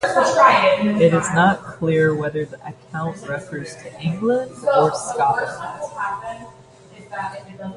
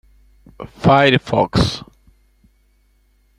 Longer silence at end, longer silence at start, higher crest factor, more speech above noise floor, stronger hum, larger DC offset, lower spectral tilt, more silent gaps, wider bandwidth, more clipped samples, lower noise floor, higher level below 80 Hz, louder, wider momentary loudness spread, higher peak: second, 0 s vs 1.6 s; second, 0 s vs 0.6 s; about the same, 18 dB vs 18 dB; second, 25 dB vs 42 dB; second, none vs 50 Hz at -45 dBFS; neither; about the same, -5.5 dB/octave vs -6 dB/octave; neither; second, 11.5 kHz vs 14.5 kHz; neither; second, -44 dBFS vs -58 dBFS; second, -56 dBFS vs -40 dBFS; second, -19 LUFS vs -15 LUFS; second, 17 LU vs 22 LU; about the same, 0 dBFS vs -2 dBFS